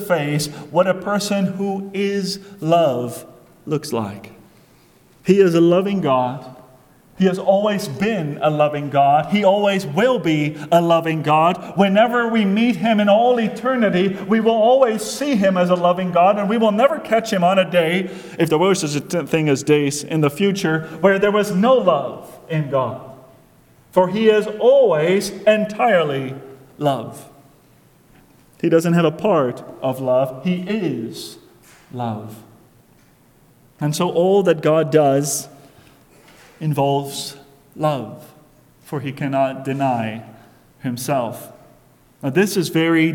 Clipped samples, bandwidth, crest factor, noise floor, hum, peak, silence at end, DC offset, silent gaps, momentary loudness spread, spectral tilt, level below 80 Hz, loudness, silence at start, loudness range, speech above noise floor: under 0.1%; 18.5 kHz; 18 dB; -53 dBFS; none; 0 dBFS; 0 s; under 0.1%; none; 13 LU; -5.5 dB/octave; -60 dBFS; -18 LUFS; 0 s; 8 LU; 35 dB